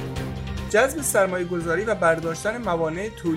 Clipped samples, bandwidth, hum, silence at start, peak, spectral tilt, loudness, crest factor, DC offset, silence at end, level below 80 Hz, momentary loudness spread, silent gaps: under 0.1%; 16 kHz; none; 0 s; -6 dBFS; -4.5 dB/octave; -23 LUFS; 18 dB; under 0.1%; 0 s; -42 dBFS; 10 LU; none